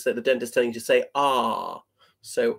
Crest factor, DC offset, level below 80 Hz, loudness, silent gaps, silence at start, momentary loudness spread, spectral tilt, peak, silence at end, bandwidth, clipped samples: 16 dB; under 0.1%; -76 dBFS; -24 LUFS; none; 0 s; 10 LU; -3 dB/octave; -8 dBFS; 0 s; 16 kHz; under 0.1%